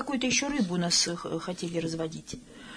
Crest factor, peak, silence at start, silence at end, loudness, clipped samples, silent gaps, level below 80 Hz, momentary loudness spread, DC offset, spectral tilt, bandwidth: 18 dB; -12 dBFS; 0 s; 0 s; -28 LUFS; under 0.1%; none; -58 dBFS; 15 LU; under 0.1%; -3 dB/octave; 10.5 kHz